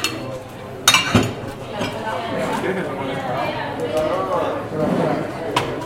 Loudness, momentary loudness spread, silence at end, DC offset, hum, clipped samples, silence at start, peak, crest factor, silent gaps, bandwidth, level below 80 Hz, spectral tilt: -21 LUFS; 13 LU; 0 s; under 0.1%; none; under 0.1%; 0 s; 0 dBFS; 22 dB; none; 16.5 kHz; -46 dBFS; -3.5 dB/octave